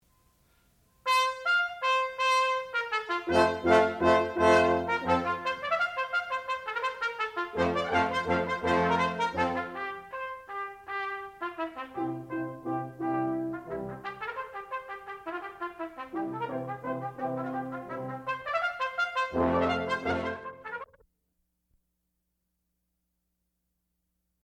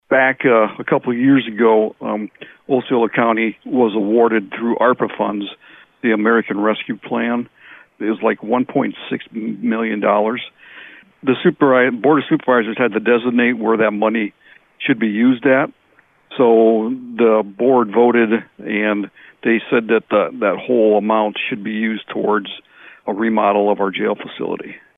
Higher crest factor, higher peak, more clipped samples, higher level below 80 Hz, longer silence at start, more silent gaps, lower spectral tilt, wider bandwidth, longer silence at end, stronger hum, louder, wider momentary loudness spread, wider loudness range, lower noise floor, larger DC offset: first, 20 dB vs 14 dB; second, -10 dBFS vs -4 dBFS; neither; about the same, -64 dBFS vs -64 dBFS; first, 1.05 s vs 0.1 s; neither; second, -5 dB/octave vs -9.5 dB/octave; first, 15.5 kHz vs 3.9 kHz; first, 3.6 s vs 0.2 s; neither; second, -30 LUFS vs -17 LUFS; about the same, 13 LU vs 11 LU; first, 11 LU vs 4 LU; first, -80 dBFS vs -55 dBFS; neither